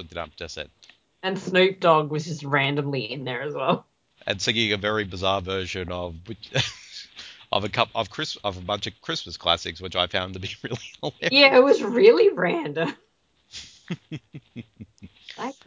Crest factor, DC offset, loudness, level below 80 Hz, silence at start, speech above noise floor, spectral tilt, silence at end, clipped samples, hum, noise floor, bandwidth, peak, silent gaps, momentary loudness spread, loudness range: 22 dB; under 0.1%; -23 LUFS; -52 dBFS; 0 s; 40 dB; -4.5 dB/octave; 0.15 s; under 0.1%; none; -63 dBFS; 7.6 kHz; -2 dBFS; none; 23 LU; 8 LU